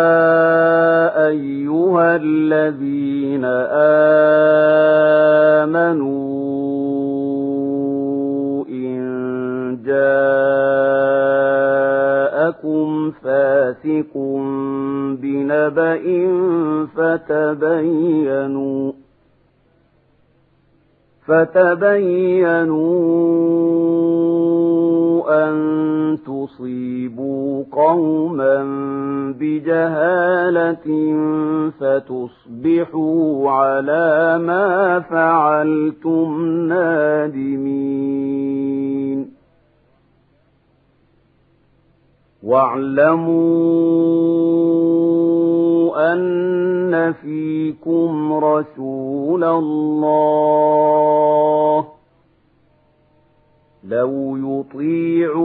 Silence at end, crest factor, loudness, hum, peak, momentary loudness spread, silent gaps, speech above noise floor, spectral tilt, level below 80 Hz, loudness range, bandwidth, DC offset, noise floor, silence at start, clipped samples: 0 s; 16 dB; -16 LUFS; none; 0 dBFS; 9 LU; none; 42 dB; -11.5 dB/octave; -66 dBFS; 7 LU; 4.3 kHz; under 0.1%; -58 dBFS; 0 s; under 0.1%